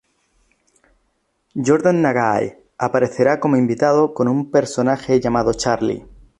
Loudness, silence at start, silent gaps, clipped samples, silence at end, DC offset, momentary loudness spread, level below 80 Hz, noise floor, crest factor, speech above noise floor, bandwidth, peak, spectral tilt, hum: -18 LUFS; 1.55 s; none; under 0.1%; 0.4 s; under 0.1%; 8 LU; -48 dBFS; -67 dBFS; 16 dB; 50 dB; 11 kHz; -2 dBFS; -6 dB/octave; none